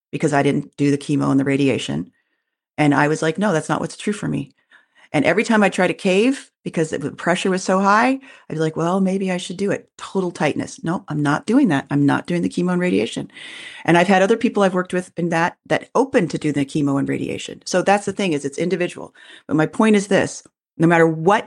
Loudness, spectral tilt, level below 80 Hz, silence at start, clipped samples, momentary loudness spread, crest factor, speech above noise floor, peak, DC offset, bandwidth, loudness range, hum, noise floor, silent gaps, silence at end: -19 LUFS; -6 dB/octave; -60 dBFS; 0.15 s; under 0.1%; 11 LU; 16 dB; 56 dB; -4 dBFS; under 0.1%; 11.5 kHz; 3 LU; none; -74 dBFS; none; 0 s